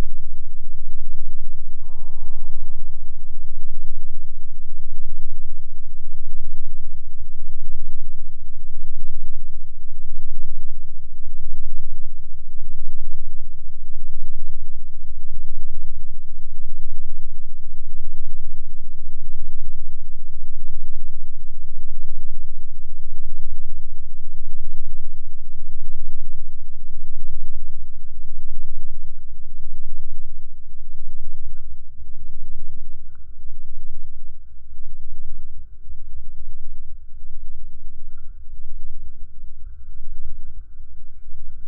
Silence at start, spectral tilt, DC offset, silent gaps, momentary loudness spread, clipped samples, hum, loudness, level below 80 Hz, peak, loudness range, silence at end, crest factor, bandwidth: 0 s; -12 dB/octave; under 0.1%; none; 8 LU; under 0.1%; none; -38 LUFS; -22 dBFS; -2 dBFS; 5 LU; 0 s; 8 dB; 0.1 kHz